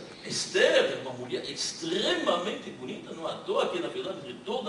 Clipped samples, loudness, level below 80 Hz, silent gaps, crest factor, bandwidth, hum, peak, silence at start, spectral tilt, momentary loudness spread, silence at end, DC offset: under 0.1%; -29 LUFS; -70 dBFS; none; 20 dB; 11.5 kHz; none; -10 dBFS; 0 s; -2.5 dB/octave; 14 LU; 0 s; under 0.1%